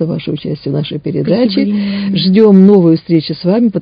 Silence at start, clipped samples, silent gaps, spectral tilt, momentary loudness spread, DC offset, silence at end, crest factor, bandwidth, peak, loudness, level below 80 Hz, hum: 0 s; 1%; none; -10.5 dB/octave; 12 LU; under 0.1%; 0 s; 10 dB; 5.2 kHz; 0 dBFS; -11 LUFS; -50 dBFS; none